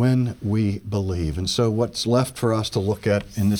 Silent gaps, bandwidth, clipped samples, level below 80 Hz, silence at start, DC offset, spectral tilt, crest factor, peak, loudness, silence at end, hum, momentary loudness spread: none; 18.5 kHz; under 0.1%; -42 dBFS; 0 s; under 0.1%; -6 dB/octave; 14 dB; -6 dBFS; -23 LUFS; 0 s; none; 4 LU